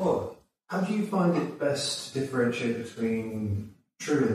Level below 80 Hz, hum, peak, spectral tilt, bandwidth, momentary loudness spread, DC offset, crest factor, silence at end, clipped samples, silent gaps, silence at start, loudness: -64 dBFS; none; -14 dBFS; -5.5 dB/octave; 15 kHz; 9 LU; under 0.1%; 16 dB; 0 s; under 0.1%; none; 0 s; -29 LUFS